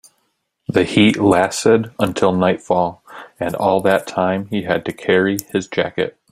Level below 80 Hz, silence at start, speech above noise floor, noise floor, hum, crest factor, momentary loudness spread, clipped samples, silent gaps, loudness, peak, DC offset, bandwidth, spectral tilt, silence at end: -54 dBFS; 0.7 s; 52 dB; -68 dBFS; none; 16 dB; 9 LU; under 0.1%; none; -17 LUFS; 0 dBFS; under 0.1%; 16 kHz; -5.5 dB/octave; 0.2 s